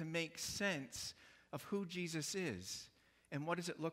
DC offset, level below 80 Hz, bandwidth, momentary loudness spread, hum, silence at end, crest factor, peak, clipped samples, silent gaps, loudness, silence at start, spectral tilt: under 0.1%; -74 dBFS; 16 kHz; 11 LU; none; 0 s; 18 dB; -26 dBFS; under 0.1%; none; -43 LUFS; 0 s; -3.5 dB/octave